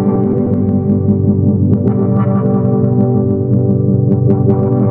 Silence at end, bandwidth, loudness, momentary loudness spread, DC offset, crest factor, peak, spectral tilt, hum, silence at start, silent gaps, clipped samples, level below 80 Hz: 0 s; 2.5 kHz; -13 LUFS; 2 LU; under 0.1%; 10 dB; 0 dBFS; -14.5 dB/octave; none; 0 s; none; under 0.1%; -40 dBFS